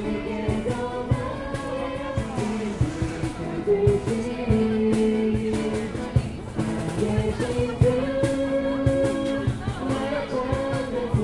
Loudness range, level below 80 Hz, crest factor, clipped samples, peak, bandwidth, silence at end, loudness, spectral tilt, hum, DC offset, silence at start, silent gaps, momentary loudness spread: 3 LU; -38 dBFS; 20 dB; under 0.1%; -4 dBFS; 11.5 kHz; 0 s; -25 LUFS; -7 dB/octave; none; under 0.1%; 0 s; none; 7 LU